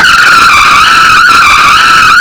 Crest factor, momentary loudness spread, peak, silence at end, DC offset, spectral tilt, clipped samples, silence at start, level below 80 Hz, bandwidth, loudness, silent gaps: 2 dB; 1 LU; 0 dBFS; 0 s; under 0.1%; -0.5 dB/octave; 30%; 0 s; -30 dBFS; over 20 kHz; -1 LUFS; none